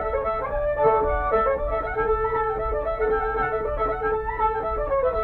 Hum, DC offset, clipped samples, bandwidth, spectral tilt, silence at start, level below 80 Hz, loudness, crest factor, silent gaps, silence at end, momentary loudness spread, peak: none; under 0.1%; under 0.1%; 4.2 kHz; -8.5 dB/octave; 0 s; -34 dBFS; -24 LUFS; 14 dB; none; 0 s; 5 LU; -8 dBFS